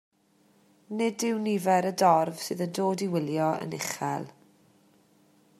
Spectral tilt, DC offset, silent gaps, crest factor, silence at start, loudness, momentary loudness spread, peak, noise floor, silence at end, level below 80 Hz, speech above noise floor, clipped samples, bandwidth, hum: -5 dB/octave; under 0.1%; none; 20 dB; 0.9 s; -28 LUFS; 10 LU; -10 dBFS; -65 dBFS; 1.3 s; -78 dBFS; 38 dB; under 0.1%; 15 kHz; none